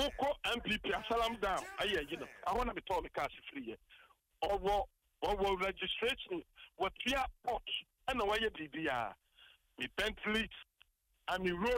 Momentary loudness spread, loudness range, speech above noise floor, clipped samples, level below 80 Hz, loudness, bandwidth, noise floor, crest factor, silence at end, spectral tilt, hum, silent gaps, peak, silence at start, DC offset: 10 LU; 3 LU; 34 dB; under 0.1%; -54 dBFS; -37 LUFS; 16 kHz; -72 dBFS; 14 dB; 0 s; -4 dB/octave; none; none; -24 dBFS; 0 s; under 0.1%